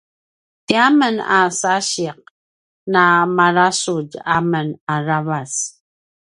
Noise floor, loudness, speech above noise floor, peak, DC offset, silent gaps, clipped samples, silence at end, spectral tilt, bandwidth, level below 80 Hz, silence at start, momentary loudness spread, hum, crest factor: under -90 dBFS; -17 LUFS; over 73 dB; 0 dBFS; under 0.1%; 2.30-2.86 s, 4.80-4.87 s; under 0.1%; 0.6 s; -4 dB/octave; 11.5 kHz; -62 dBFS; 0.7 s; 10 LU; none; 18 dB